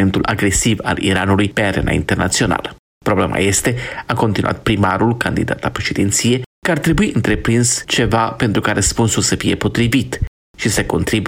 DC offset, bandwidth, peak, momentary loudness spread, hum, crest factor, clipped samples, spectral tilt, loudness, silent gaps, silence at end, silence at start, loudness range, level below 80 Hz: under 0.1%; 16.5 kHz; -4 dBFS; 5 LU; none; 12 dB; under 0.1%; -4.5 dB/octave; -16 LUFS; 2.79-3.01 s, 6.46-6.62 s, 10.28-10.54 s; 0 s; 0 s; 2 LU; -32 dBFS